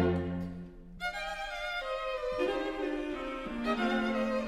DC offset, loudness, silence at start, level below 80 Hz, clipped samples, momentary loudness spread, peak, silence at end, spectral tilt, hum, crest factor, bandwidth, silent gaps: under 0.1%; -34 LUFS; 0 s; -50 dBFS; under 0.1%; 9 LU; -16 dBFS; 0 s; -6 dB/octave; none; 16 dB; 15 kHz; none